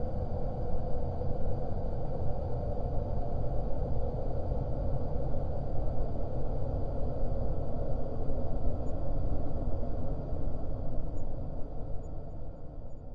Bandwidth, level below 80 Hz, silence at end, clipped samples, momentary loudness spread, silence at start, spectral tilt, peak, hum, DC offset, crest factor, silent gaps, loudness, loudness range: 1.6 kHz; -34 dBFS; 0 s; under 0.1%; 6 LU; 0 s; -11 dB/octave; -16 dBFS; none; under 0.1%; 12 dB; none; -37 LUFS; 3 LU